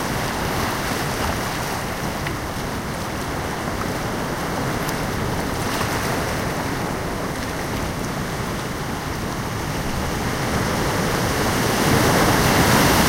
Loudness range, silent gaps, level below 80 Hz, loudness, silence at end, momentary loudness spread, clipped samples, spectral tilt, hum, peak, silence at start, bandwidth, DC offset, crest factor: 6 LU; none; -34 dBFS; -22 LUFS; 0 s; 10 LU; under 0.1%; -4.5 dB/octave; none; -4 dBFS; 0 s; 17 kHz; under 0.1%; 18 dB